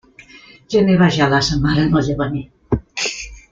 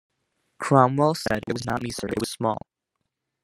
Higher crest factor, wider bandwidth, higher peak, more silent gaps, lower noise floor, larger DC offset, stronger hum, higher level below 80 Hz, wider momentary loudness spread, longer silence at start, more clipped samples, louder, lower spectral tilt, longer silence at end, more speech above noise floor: second, 16 dB vs 24 dB; second, 7.6 kHz vs 15.5 kHz; about the same, -2 dBFS vs -2 dBFS; neither; second, -44 dBFS vs -80 dBFS; neither; neither; first, -36 dBFS vs -56 dBFS; about the same, 10 LU vs 10 LU; second, 0.35 s vs 0.6 s; neither; first, -17 LUFS vs -24 LUFS; about the same, -5.5 dB/octave vs -6 dB/octave; second, 0.1 s vs 0.85 s; second, 29 dB vs 57 dB